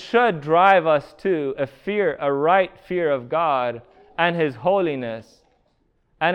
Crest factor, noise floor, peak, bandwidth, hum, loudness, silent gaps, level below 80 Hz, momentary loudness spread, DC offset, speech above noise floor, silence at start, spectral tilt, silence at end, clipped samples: 20 dB; -65 dBFS; -2 dBFS; 8.6 kHz; none; -21 LUFS; none; -60 dBFS; 12 LU; under 0.1%; 45 dB; 0 s; -7 dB/octave; 0 s; under 0.1%